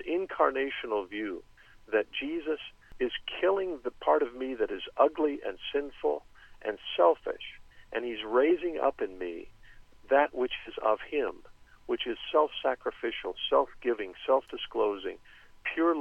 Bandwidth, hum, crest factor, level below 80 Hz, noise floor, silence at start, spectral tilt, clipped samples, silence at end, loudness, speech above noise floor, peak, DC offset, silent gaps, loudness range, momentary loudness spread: 6.8 kHz; none; 20 dB; -58 dBFS; -52 dBFS; 0 s; -5 dB/octave; under 0.1%; 0 s; -31 LUFS; 23 dB; -10 dBFS; under 0.1%; none; 2 LU; 12 LU